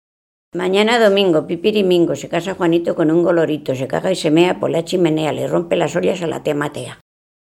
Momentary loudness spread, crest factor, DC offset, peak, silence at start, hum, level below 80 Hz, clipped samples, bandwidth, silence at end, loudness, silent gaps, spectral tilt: 8 LU; 16 dB; under 0.1%; 0 dBFS; 0.55 s; none; -56 dBFS; under 0.1%; 13 kHz; 0.55 s; -17 LUFS; none; -5.5 dB/octave